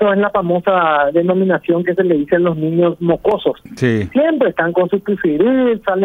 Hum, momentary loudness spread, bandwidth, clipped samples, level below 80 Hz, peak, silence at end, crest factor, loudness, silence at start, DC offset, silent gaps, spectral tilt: none; 4 LU; 7 kHz; under 0.1%; -50 dBFS; -2 dBFS; 0 s; 14 dB; -15 LUFS; 0 s; under 0.1%; none; -8 dB/octave